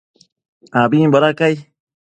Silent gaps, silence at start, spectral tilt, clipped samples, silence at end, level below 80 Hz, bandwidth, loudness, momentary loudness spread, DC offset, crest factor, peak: none; 0.75 s; -7.5 dB/octave; under 0.1%; 0.55 s; -62 dBFS; 9 kHz; -15 LUFS; 9 LU; under 0.1%; 16 dB; 0 dBFS